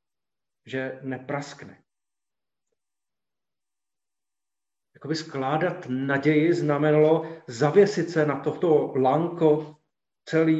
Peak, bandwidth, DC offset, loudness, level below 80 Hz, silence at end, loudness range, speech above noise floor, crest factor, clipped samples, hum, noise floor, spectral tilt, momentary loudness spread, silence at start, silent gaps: -6 dBFS; 8 kHz; under 0.1%; -24 LUFS; -72 dBFS; 0 s; 17 LU; over 67 dB; 18 dB; under 0.1%; none; under -90 dBFS; -7 dB/octave; 13 LU; 0.65 s; none